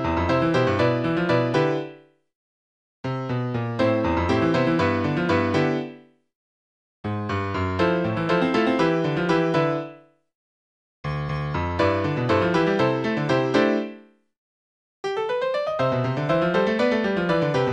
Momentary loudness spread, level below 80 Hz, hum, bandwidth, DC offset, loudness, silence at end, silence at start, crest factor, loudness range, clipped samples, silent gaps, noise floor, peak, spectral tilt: 9 LU; -48 dBFS; none; 9.2 kHz; under 0.1%; -23 LUFS; 0 s; 0 s; 18 dB; 3 LU; under 0.1%; 2.35-3.04 s, 6.35-7.04 s, 10.35-11.04 s, 14.38-15.03 s; -46 dBFS; -4 dBFS; -7 dB/octave